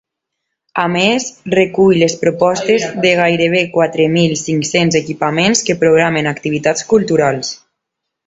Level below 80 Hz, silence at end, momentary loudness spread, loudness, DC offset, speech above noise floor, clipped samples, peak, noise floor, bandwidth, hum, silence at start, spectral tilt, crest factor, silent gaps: -52 dBFS; 0.7 s; 6 LU; -13 LUFS; under 0.1%; 64 dB; under 0.1%; 0 dBFS; -77 dBFS; 8.2 kHz; none; 0.75 s; -4.5 dB/octave; 14 dB; none